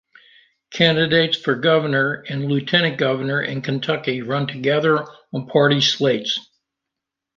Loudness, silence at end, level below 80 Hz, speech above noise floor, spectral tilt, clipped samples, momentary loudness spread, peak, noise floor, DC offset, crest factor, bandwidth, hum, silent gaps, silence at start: -19 LUFS; 0.95 s; -62 dBFS; 64 dB; -5 dB/octave; under 0.1%; 8 LU; -2 dBFS; -84 dBFS; under 0.1%; 18 dB; 7.4 kHz; none; none; 0.7 s